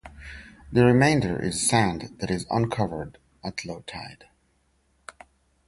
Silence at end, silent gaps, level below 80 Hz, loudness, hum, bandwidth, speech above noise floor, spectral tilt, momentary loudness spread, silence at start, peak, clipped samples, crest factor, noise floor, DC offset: 1.55 s; none; -48 dBFS; -24 LUFS; none; 11.5 kHz; 43 dB; -5 dB/octave; 23 LU; 0.05 s; -6 dBFS; under 0.1%; 20 dB; -67 dBFS; under 0.1%